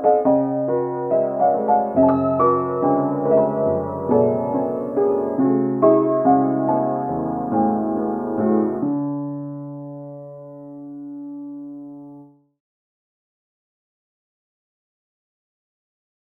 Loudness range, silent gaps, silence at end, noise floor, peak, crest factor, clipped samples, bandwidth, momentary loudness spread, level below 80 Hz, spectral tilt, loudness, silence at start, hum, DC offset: 19 LU; none; 4.05 s; -45 dBFS; -4 dBFS; 18 dB; under 0.1%; 2.8 kHz; 19 LU; -58 dBFS; -12.5 dB/octave; -19 LUFS; 0 s; none; under 0.1%